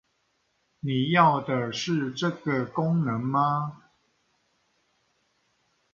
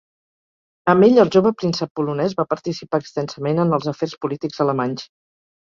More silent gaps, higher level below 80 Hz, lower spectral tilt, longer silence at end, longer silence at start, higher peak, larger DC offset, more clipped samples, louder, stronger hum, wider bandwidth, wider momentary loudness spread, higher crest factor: second, none vs 1.91-1.95 s; second, -68 dBFS vs -60 dBFS; about the same, -6 dB/octave vs -7 dB/octave; first, 2.2 s vs 0.7 s; about the same, 0.85 s vs 0.85 s; second, -6 dBFS vs -2 dBFS; neither; neither; second, -26 LUFS vs -19 LUFS; neither; about the same, 7.4 kHz vs 7.4 kHz; about the same, 10 LU vs 12 LU; about the same, 22 dB vs 18 dB